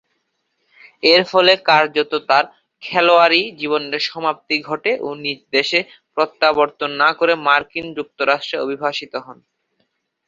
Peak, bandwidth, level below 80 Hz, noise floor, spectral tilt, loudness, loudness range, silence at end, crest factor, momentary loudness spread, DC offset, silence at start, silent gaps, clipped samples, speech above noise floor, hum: 0 dBFS; 7.6 kHz; -66 dBFS; -70 dBFS; -4 dB/octave; -17 LUFS; 4 LU; 0.95 s; 18 dB; 14 LU; under 0.1%; 1.05 s; none; under 0.1%; 53 dB; none